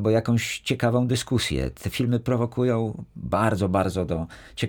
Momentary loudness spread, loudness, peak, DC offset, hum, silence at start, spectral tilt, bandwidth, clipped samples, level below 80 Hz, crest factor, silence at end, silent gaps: 7 LU; -25 LUFS; -8 dBFS; under 0.1%; none; 0 s; -6 dB/octave; 20 kHz; under 0.1%; -44 dBFS; 16 dB; 0 s; none